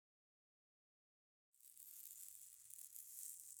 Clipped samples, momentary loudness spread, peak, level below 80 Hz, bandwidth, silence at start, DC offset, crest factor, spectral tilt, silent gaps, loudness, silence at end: under 0.1%; 9 LU; -30 dBFS; under -90 dBFS; over 20 kHz; 1.55 s; under 0.1%; 30 dB; 3 dB/octave; none; -55 LUFS; 0 s